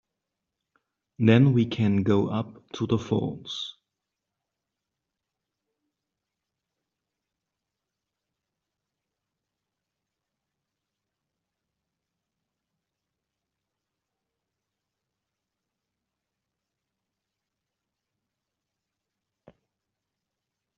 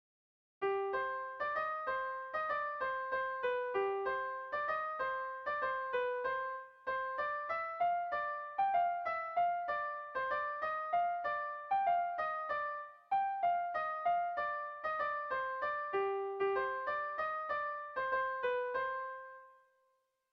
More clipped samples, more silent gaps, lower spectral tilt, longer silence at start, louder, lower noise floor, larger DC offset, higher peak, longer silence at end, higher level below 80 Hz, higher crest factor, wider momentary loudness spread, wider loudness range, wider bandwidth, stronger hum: neither; neither; first, -7 dB/octave vs -5.5 dB/octave; first, 1.2 s vs 0.6 s; first, -24 LUFS vs -37 LUFS; first, -86 dBFS vs -78 dBFS; neither; first, -6 dBFS vs -22 dBFS; first, 17.05 s vs 0.8 s; first, -68 dBFS vs -74 dBFS; first, 28 dB vs 14 dB; first, 15 LU vs 5 LU; first, 16 LU vs 2 LU; first, 7.2 kHz vs 6 kHz; neither